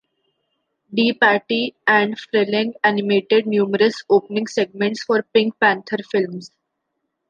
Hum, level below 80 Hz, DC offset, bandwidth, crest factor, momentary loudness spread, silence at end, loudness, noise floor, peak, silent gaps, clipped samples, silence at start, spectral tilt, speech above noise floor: none; -72 dBFS; under 0.1%; 7.6 kHz; 18 dB; 7 LU; 0.85 s; -18 LUFS; -76 dBFS; -2 dBFS; none; under 0.1%; 0.9 s; -5 dB/octave; 57 dB